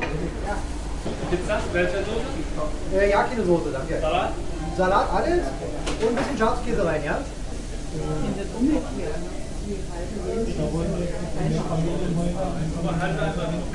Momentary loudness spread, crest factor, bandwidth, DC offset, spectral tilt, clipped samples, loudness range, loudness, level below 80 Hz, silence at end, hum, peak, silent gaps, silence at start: 10 LU; 16 dB; 11.5 kHz; under 0.1%; -6 dB/octave; under 0.1%; 5 LU; -26 LUFS; -32 dBFS; 0 s; none; -8 dBFS; none; 0 s